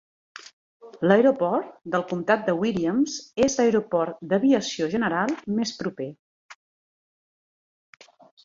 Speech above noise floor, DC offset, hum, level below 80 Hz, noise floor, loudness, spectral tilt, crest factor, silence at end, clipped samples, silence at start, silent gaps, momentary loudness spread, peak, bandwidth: over 67 dB; under 0.1%; none; -62 dBFS; under -90 dBFS; -24 LUFS; -5 dB/octave; 20 dB; 1.9 s; under 0.1%; 0.35 s; 0.53-0.80 s, 6.19-6.49 s; 12 LU; -4 dBFS; 7.8 kHz